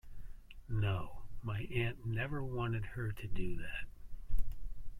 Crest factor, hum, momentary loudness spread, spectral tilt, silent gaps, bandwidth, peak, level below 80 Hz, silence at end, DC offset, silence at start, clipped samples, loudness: 16 dB; none; 19 LU; -7.5 dB/octave; none; 14 kHz; -18 dBFS; -44 dBFS; 0 s; under 0.1%; 0.05 s; under 0.1%; -40 LUFS